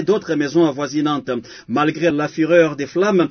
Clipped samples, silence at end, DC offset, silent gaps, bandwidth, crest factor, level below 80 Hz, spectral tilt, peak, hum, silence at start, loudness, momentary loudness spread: under 0.1%; 0 s; under 0.1%; none; 6.6 kHz; 18 dB; -60 dBFS; -6 dB/octave; 0 dBFS; none; 0 s; -18 LUFS; 8 LU